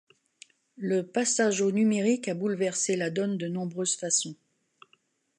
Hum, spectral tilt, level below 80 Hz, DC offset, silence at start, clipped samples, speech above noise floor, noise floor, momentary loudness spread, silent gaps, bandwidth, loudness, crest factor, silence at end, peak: none; -4 dB/octave; -78 dBFS; under 0.1%; 0.8 s; under 0.1%; 41 dB; -68 dBFS; 6 LU; none; 11.5 kHz; -27 LUFS; 18 dB; 1.05 s; -12 dBFS